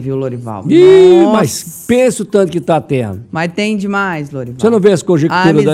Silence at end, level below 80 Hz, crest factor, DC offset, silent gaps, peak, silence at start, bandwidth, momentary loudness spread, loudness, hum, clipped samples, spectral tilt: 0 s; -50 dBFS; 10 dB; under 0.1%; none; 0 dBFS; 0 s; 14 kHz; 14 LU; -11 LUFS; none; 0.5%; -6 dB/octave